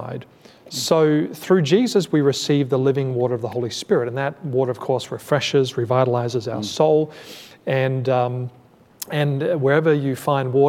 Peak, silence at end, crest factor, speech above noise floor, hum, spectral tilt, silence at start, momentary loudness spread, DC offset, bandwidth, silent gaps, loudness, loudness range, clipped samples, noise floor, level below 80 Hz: -4 dBFS; 0 s; 16 dB; 20 dB; none; -6 dB/octave; 0 s; 10 LU; under 0.1%; 16.5 kHz; none; -20 LUFS; 3 LU; under 0.1%; -39 dBFS; -68 dBFS